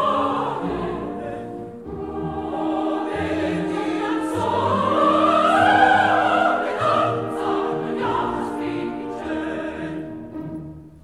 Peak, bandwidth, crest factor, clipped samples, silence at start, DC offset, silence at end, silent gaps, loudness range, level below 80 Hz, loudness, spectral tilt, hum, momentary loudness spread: -4 dBFS; 12.5 kHz; 18 dB; under 0.1%; 0 s; 0.1%; 0.05 s; none; 8 LU; -50 dBFS; -21 LUFS; -6 dB/octave; none; 16 LU